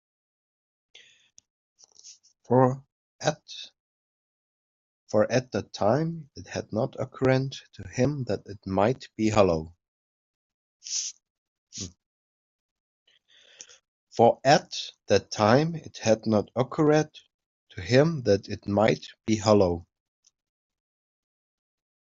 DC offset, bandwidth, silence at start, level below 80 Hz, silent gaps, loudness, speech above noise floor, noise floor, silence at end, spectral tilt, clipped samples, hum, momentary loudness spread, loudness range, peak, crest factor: under 0.1%; 7.8 kHz; 2.05 s; -60 dBFS; 2.92-3.19 s, 3.80-5.07 s, 9.88-10.80 s, 11.30-11.67 s, 12.06-13.06 s, 13.88-14.07 s, 17.34-17.39 s, 17.46-17.67 s; -25 LUFS; 34 dB; -59 dBFS; 2.35 s; -5.5 dB/octave; under 0.1%; none; 17 LU; 7 LU; -4 dBFS; 24 dB